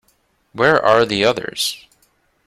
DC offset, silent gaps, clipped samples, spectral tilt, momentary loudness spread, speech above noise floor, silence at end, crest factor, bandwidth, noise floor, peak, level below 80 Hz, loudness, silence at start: under 0.1%; none; under 0.1%; -3.5 dB/octave; 15 LU; 46 dB; 0.7 s; 18 dB; 16 kHz; -62 dBFS; 0 dBFS; -54 dBFS; -16 LUFS; 0.55 s